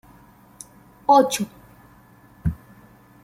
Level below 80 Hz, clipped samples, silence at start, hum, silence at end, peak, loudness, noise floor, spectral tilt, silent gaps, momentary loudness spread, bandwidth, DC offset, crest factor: -44 dBFS; under 0.1%; 1.1 s; none; 0.7 s; -4 dBFS; -21 LUFS; -51 dBFS; -5 dB/octave; none; 27 LU; 16.5 kHz; under 0.1%; 22 dB